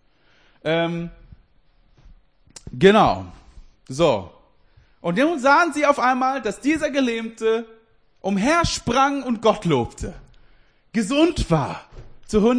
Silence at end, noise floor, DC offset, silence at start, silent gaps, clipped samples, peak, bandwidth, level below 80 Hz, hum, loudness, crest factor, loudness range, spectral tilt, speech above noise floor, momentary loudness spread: 0 s; -59 dBFS; under 0.1%; 0.65 s; none; under 0.1%; -2 dBFS; 10.5 kHz; -42 dBFS; none; -20 LUFS; 20 dB; 2 LU; -5.5 dB/octave; 39 dB; 15 LU